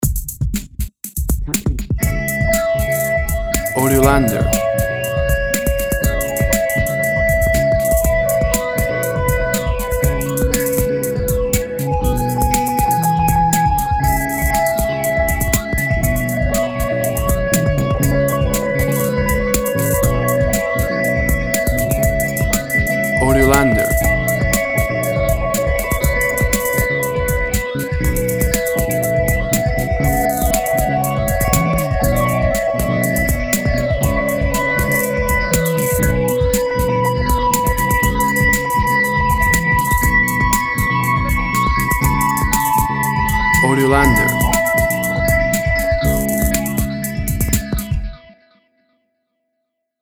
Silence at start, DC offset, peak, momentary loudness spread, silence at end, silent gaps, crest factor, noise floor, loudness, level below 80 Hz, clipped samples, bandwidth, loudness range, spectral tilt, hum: 0 s; under 0.1%; 0 dBFS; 5 LU; 1.85 s; none; 16 dB; -74 dBFS; -16 LUFS; -24 dBFS; under 0.1%; over 20 kHz; 3 LU; -5 dB/octave; none